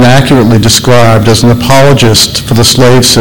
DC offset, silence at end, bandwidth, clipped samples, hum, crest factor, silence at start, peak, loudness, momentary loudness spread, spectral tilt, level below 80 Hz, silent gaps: 10%; 0 s; over 20 kHz; 2%; none; 4 dB; 0 s; 0 dBFS; -4 LUFS; 2 LU; -4.5 dB/octave; -26 dBFS; none